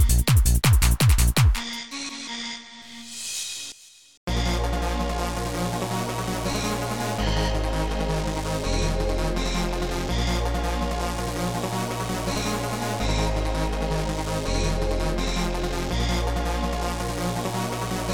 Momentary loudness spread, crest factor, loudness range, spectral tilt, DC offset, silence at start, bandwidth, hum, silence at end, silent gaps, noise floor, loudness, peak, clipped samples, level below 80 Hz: 11 LU; 16 dB; 4 LU; -4.5 dB/octave; 0.5%; 0 s; 19 kHz; none; 0 s; 4.17-4.27 s; -45 dBFS; -25 LUFS; -8 dBFS; under 0.1%; -28 dBFS